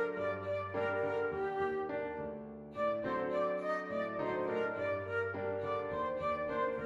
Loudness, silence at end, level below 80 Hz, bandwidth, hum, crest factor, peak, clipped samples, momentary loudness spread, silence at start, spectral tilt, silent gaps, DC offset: -37 LUFS; 0 s; -68 dBFS; 7.6 kHz; none; 14 dB; -22 dBFS; under 0.1%; 4 LU; 0 s; -7.5 dB/octave; none; under 0.1%